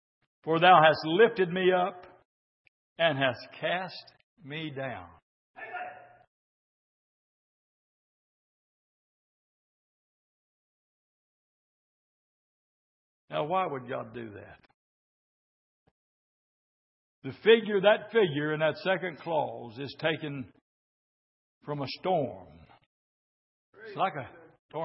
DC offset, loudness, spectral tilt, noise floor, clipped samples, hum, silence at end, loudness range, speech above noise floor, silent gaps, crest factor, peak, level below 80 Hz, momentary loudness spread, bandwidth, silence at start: under 0.1%; -27 LUFS; -9 dB/octave; under -90 dBFS; under 0.1%; none; 0 s; 17 LU; over 62 dB; 2.25-2.96 s, 4.23-4.37 s, 5.22-5.54 s, 6.27-13.28 s, 14.74-17.22 s, 20.61-21.61 s, 22.86-23.73 s, 24.59-24.69 s; 26 dB; -6 dBFS; -76 dBFS; 21 LU; 5.8 kHz; 0.45 s